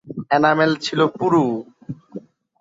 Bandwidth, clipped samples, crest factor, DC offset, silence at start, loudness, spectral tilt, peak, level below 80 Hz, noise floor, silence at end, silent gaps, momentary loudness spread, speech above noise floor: 7.8 kHz; under 0.1%; 18 dB; under 0.1%; 0.05 s; -18 LUFS; -6 dB/octave; -2 dBFS; -62 dBFS; -39 dBFS; 0.4 s; none; 20 LU; 21 dB